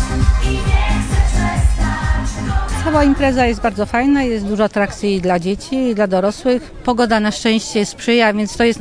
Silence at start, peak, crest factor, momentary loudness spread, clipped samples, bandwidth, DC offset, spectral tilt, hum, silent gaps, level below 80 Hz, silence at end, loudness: 0 s; -2 dBFS; 14 dB; 5 LU; under 0.1%; 10.5 kHz; under 0.1%; -5.5 dB/octave; none; none; -20 dBFS; 0 s; -16 LUFS